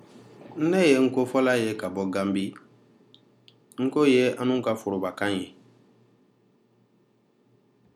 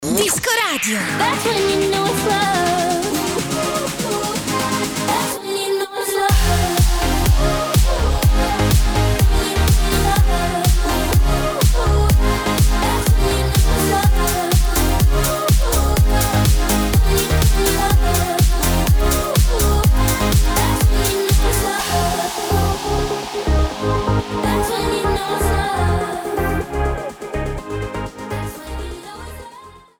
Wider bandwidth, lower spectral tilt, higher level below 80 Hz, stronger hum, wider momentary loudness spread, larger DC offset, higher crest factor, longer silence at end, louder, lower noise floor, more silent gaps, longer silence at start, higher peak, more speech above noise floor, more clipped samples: second, 13.5 kHz vs over 20 kHz; about the same, -5.5 dB/octave vs -4.5 dB/octave; second, -76 dBFS vs -20 dBFS; neither; first, 12 LU vs 6 LU; neither; first, 20 dB vs 12 dB; first, 2.45 s vs 0.2 s; second, -24 LUFS vs -17 LUFS; first, -65 dBFS vs -41 dBFS; neither; first, 0.15 s vs 0 s; about the same, -6 dBFS vs -4 dBFS; first, 41 dB vs 23 dB; neither